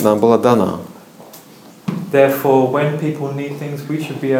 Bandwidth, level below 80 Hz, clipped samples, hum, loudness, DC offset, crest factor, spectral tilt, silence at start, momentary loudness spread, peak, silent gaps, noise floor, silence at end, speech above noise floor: 18.5 kHz; -62 dBFS; under 0.1%; none; -16 LUFS; under 0.1%; 16 dB; -7 dB/octave; 0 s; 13 LU; 0 dBFS; none; -41 dBFS; 0 s; 26 dB